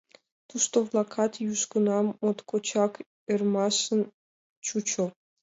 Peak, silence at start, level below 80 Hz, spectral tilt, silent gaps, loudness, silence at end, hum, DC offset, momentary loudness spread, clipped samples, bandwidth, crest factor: -12 dBFS; 0.55 s; -76 dBFS; -4 dB/octave; 3.06-3.27 s, 4.14-4.62 s; -28 LUFS; 0.3 s; none; under 0.1%; 8 LU; under 0.1%; 8 kHz; 18 dB